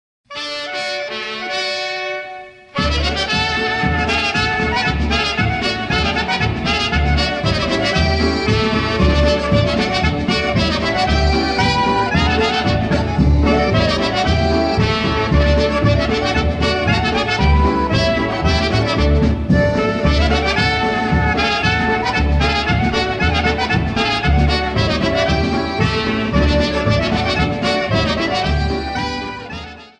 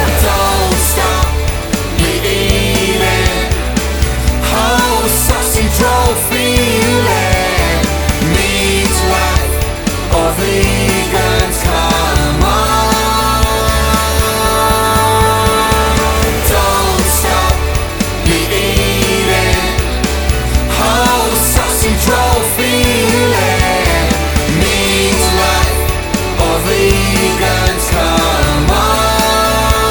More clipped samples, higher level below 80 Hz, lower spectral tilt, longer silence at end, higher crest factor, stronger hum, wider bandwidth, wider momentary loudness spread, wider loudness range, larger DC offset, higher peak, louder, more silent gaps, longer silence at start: neither; second, -24 dBFS vs -18 dBFS; first, -5.5 dB/octave vs -4 dB/octave; first, 0.15 s vs 0 s; about the same, 14 dB vs 12 dB; neither; second, 9.8 kHz vs over 20 kHz; about the same, 6 LU vs 4 LU; about the same, 2 LU vs 2 LU; neither; about the same, -2 dBFS vs 0 dBFS; second, -16 LUFS vs -12 LUFS; neither; first, 0.3 s vs 0 s